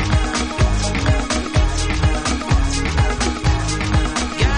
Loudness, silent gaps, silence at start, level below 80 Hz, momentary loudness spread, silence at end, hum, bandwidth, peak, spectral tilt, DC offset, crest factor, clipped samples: -19 LUFS; none; 0 s; -20 dBFS; 1 LU; 0 s; none; 10.5 kHz; -4 dBFS; -4.5 dB/octave; under 0.1%; 12 dB; under 0.1%